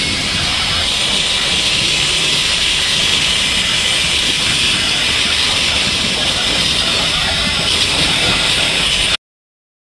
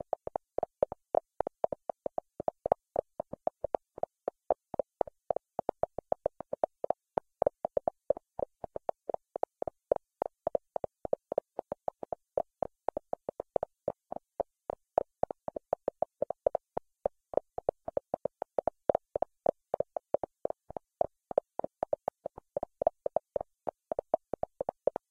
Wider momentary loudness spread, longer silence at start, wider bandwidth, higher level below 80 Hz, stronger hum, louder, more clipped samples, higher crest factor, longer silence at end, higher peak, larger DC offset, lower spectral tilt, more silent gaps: second, 2 LU vs 8 LU; second, 0 s vs 0.6 s; first, 12 kHz vs 4.4 kHz; first, -34 dBFS vs -64 dBFS; neither; first, -12 LUFS vs -37 LUFS; neither; second, 16 dB vs 28 dB; second, 0.8 s vs 0.95 s; first, 0 dBFS vs -8 dBFS; neither; second, -1 dB/octave vs -9 dB/octave; neither